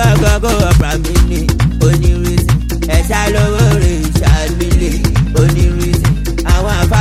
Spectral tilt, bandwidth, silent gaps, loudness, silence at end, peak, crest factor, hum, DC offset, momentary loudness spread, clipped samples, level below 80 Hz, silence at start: -6 dB/octave; 15.5 kHz; none; -12 LUFS; 0 s; 0 dBFS; 10 dB; none; under 0.1%; 3 LU; under 0.1%; -14 dBFS; 0 s